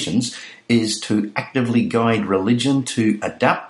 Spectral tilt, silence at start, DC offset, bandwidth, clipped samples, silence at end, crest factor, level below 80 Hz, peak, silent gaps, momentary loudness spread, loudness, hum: -5 dB/octave; 0 s; under 0.1%; 11.5 kHz; under 0.1%; 0 s; 18 dB; -60 dBFS; 0 dBFS; none; 5 LU; -19 LUFS; none